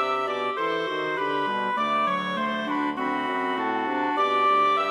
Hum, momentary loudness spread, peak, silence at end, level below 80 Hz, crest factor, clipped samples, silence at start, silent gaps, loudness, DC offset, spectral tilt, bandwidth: none; 6 LU; -12 dBFS; 0 s; -70 dBFS; 12 dB; under 0.1%; 0 s; none; -25 LUFS; under 0.1%; -5 dB/octave; 11 kHz